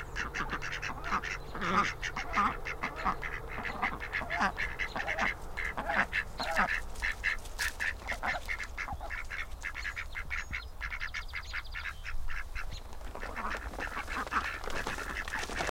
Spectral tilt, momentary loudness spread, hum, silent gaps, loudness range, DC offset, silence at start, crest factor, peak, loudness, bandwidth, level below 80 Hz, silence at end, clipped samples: -3.5 dB/octave; 9 LU; none; none; 7 LU; under 0.1%; 0 s; 20 dB; -14 dBFS; -35 LUFS; 16.5 kHz; -44 dBFS; 0.1 s; under 0.1%